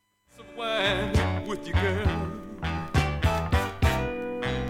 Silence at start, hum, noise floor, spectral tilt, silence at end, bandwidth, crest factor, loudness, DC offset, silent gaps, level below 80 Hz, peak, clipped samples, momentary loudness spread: 0.4 s; none; -52 dBFS; -6 dB/octave; 0 s; 16.5 kHz; 18 dB; -27 LUFS; under 0.1%; none; -34 dBFS; -10 dBFS; under 0.1%; 8 LU